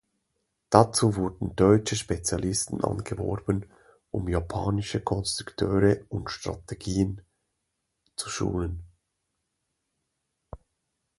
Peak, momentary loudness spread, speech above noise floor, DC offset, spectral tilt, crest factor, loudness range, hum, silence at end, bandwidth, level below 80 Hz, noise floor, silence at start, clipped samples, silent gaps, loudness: 0 dBFS; 14 LU; 54 dB; under 0.1%; -5.5 dB/octave; 28 dB; 12 LU; none; 0.6 s; 11.5 kHz; -44 dBFS; -80 dBFS; 0.7 s; under 0.1%; none; -27 LUFS